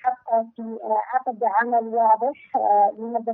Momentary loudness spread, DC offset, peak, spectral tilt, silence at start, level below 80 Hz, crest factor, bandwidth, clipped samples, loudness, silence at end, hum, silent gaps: 7 LU; under 0.1%; -8 dBFS; -5 dB/octave; 0.05 s; -80 dBFS; 14 dB; 3.6 kHz; under 0.1%; -22 LUFS; 0 s; none; none